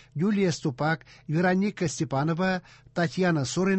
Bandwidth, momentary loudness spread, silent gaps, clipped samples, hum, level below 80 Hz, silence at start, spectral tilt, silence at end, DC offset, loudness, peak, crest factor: 8.6 kHz; 6 LU; none; under 0.1%; none; -60 dBFS; 0.15 s; -6 dB/octave; 0 s; under 0.1%; -27 LUFS; -12 dBFS; 14 dB